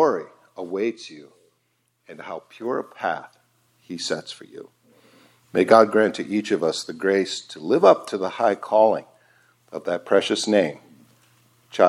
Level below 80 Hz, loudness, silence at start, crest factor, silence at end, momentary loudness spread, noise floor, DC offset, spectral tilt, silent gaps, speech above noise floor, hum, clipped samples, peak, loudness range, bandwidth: -74 dBFS; -22 LUFS; 0 s; 22 dB; 0 s; 21 LU; -70 dBFS; under 0.1%; -4.5 dB/octave; none; 48 dB; none; under 0.1%; 0 dBFS; 12 LU; 13.5 kHz